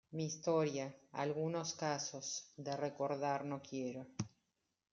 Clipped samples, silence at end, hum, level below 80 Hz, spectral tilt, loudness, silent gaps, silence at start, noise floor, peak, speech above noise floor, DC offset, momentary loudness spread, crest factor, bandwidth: under 0.1%; 0.65 s; none; -84 dBFS; -4.5 dB/octave; -41 LUFS; none; 0.1 s; -85 dBFS; -24 dBFS; 45 dB; under 0.1%; 9 LU; 18 dB; 7.6 kHz